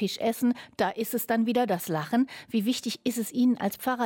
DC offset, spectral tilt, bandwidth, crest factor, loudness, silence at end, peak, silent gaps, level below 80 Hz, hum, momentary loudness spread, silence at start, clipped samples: under 0.1%; -4.5 dB/octave; 17.5 kHz; 14 dB; -28 LUFS; 0 s; -14 dBFS; none; -72 dBFS; none; 4 LU; 0 s; under 0.1%